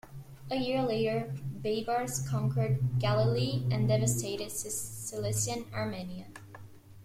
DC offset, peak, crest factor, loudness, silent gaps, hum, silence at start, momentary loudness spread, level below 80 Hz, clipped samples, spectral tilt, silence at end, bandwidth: under 0.1%; -16 dBFS; 16 dB; -31 LUFS; none; none; 0.05 s; 16 LU; -56 dBFS; under 0.1%; -5 dB/octave; 0 s; 15.5 kHz